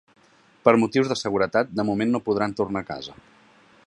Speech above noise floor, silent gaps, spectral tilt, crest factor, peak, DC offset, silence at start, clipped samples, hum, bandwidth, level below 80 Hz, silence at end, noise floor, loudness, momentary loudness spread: 32 dB; none; -6 dB/octave; 22 dB; -2 dBFS; under 0.1%; 0.65 s; under 0.1%; none; 11 kHz; -58 dBFS; 0.75 s; -55 dBFS; -23 LUFS; 12 LU